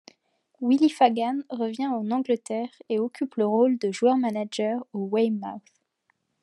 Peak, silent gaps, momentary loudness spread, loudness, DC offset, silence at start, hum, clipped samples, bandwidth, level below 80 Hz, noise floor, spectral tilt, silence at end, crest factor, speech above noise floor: -6 dBFS; none; 10 LU; -25 LUFS; under 0.1%; 0.6 s; none; under 0.1%; 11.5 kHz; -88 dBFS; -73 dBFS; -6 dB/octave; 0.85 s; 20 dB; 48 dB